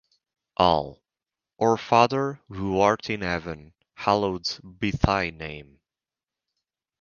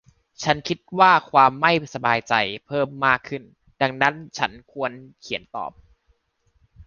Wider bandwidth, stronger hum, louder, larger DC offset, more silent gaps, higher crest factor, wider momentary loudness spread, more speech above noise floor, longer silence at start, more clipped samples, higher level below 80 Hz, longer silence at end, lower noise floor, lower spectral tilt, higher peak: about the same, 7.2 kHz vs 7.2 kHz; neither; second, -24 LUFS vs -21 LUFS; neither; neither; about the same, 26 dB vs 22 dB; about the same, 17 LU vs 16 LU; first, over 66 dB vs 45 dB; first, 0.6 s vs 0.4 s; neither; first, -44 dBFS vs -58 dBFS; first, 1.4 s vs 0.05 s; first, under -90 dBFS vs -66 dBFS; about the same, -5.5 dB/octave vs -4.5 dB/octave; about the same, -2 dBFS vs -2 dBFS